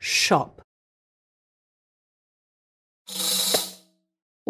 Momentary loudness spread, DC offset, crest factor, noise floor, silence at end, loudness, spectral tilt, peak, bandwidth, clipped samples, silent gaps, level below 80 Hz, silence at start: 15 LU; under 0.1%; 24 dB; -54 dBFS; 0.75 s; -22 LUFS; -1.5 dB/octave; -6 dBFS; 16 kHz; under 0.1%; 0.64-3.05 s; -68 dBFS; 0 s